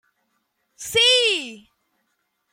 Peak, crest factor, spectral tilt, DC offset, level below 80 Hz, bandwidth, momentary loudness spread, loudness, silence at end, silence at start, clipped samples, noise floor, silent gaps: -6 dBFS; 20 dB; 0 dB/octave; under 0.1%; -64 dBFS; 16.5 kHz; 22 LU; -17 LUFS; 0.95 s; 0.8 s; under 0.1%; -73 dBFS; none